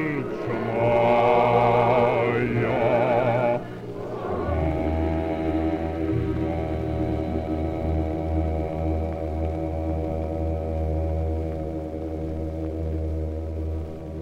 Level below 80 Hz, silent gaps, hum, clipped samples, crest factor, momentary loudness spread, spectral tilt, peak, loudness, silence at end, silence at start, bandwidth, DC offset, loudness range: -36 dBFS; none; none; under 0.1%; 18 dB; 11 LU; -9 dB/octave; -6 dBFS; -25 LUFS; 0 s; 0 s; 6.6 kHz; under 0.1%; 8 LU